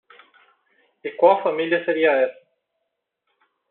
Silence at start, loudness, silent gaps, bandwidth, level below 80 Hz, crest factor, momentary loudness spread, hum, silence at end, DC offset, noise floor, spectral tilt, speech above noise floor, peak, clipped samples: 1.05 s; -20 LUFS; none; 4.2 kHz; -80 dBFS; 20 dB; 13 LU; none; 1.4 s; under 0.1%; -78 dBFS; -2 dB/octave; 60 dB; -4 dBFS; under 0.1%